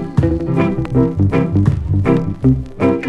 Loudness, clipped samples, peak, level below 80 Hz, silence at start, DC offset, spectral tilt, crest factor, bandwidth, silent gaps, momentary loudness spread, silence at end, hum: -16 LUFS; under 0.1%; 0 dBFS; -28 dBFS; 0 s; under 0.1%; -10 dB/octave; 14 dB; 7.6 kHz; none; 2 LU; 0 s; none